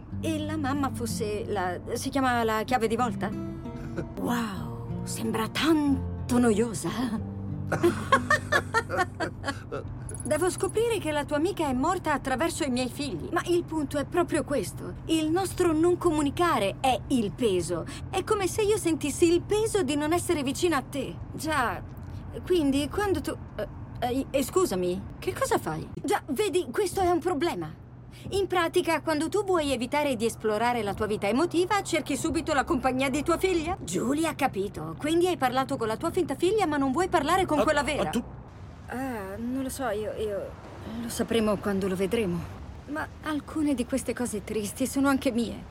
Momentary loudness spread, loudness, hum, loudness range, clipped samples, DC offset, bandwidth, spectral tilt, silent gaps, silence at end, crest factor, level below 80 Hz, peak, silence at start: 11 LU; -28 LUFS; none; 4 LU; under 0.1%; under 0.1%; 16.5 kHz; -5 dB/octave; none; 0 s; 20 dB; -48 dBFS; -8 dBFS; 0 s